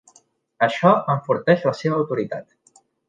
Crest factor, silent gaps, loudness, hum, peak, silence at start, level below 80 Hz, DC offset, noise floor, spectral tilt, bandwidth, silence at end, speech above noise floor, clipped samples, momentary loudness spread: 18 dB; none; -20 LUFS; none; -2 dBFS; 0.6 s; -68 dBFS; under 0.1%; -58 dBFS; -7 dB/octave; 9.2 kHz; 0.65 s; 39 dB; under 0.1%; 9 LU